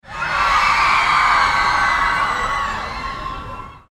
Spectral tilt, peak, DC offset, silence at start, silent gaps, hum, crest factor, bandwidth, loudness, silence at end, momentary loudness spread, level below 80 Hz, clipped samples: -2 dB/octave; -2 dBFS; under 0.1%; 0.05 s; none; none; 16 dB; 16 kHz; -16 LUFS; 0.15 s; 14 LU; -36 dBFS; under 0.1%